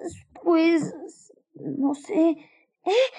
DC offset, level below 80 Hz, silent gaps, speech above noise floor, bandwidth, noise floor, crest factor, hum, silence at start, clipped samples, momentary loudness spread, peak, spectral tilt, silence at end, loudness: under 0.1%; -72 dBFS; none; 29 dB; 10 kHz; -52 dBFS; 16 dB; none; 0 s; under 0.1%; 18 LU; -10 dBFS; -5.5 dB/octave; 0 s; -24 LUFS